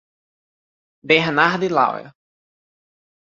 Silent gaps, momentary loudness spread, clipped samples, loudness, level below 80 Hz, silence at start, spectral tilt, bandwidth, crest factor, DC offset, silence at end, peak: none; 6 LU; under 0.1%; -17 LUFS; -66 dBFS; 1.05 s; -5.5 dB/octave; 7.6 kHz; 22 dB; under 0.1%; 1.15 s; -2 dBFS